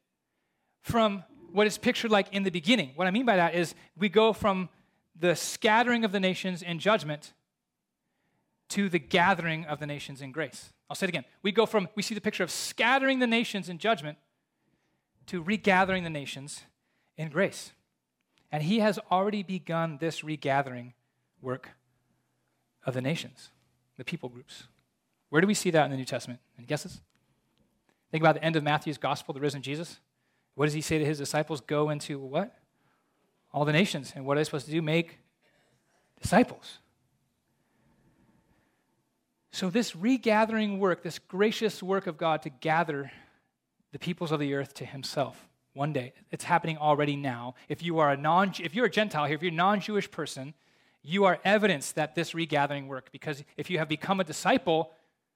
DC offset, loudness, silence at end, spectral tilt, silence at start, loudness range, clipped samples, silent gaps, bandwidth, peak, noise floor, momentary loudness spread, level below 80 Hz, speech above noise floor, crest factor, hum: under 0.1%; -29 LUFS; 0.45 s; -5 dB/octave; 0.85 s; 7 LU; under 0.1%; none; 16.5 kHz; -8 dBFS; -85 dBFS; 15 LU; -66 dBFS; 56 dB; 22 dB; none